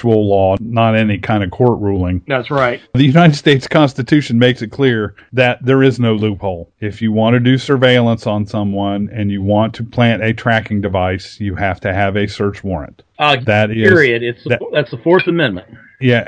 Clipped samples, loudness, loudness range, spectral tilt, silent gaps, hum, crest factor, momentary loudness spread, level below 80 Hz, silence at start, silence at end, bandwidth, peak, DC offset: 0.1%; -14 LUFS; 4 LU; -7 dB/octave; none; none; 14 dB; 9 LU; -44 dBFS; 0 s; 0 s; 9.2 kHz; 0 dBFS; under 0.1%